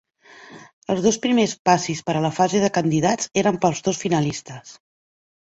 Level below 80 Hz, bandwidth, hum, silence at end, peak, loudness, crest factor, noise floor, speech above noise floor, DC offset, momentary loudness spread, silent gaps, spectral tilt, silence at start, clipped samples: -58 dBFS; 8.2 kHz; none; 0.7 s; -2 dBFS; -20 LUFS; 20 dB; -47 dBFS; 26 dB; under 0.1%; 8 LU; 0.73-0.82 s, 1.59-1.65 s; -5 dB/octave; 0.4 s; under 0.1%